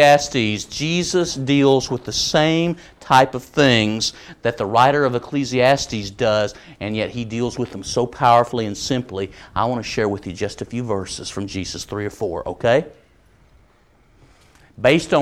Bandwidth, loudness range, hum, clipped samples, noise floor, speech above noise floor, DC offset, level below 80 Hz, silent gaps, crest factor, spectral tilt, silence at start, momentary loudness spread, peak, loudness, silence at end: 16 kHz; 7 LU; none; under 0.1%; -55 dBFS; 36 dB; under 0.1%; -46 dBFS; none; 18 dB; -4.5 dB/octave; 0 s; 12 LU; -2 dBFS; -19 LUFS; 0 s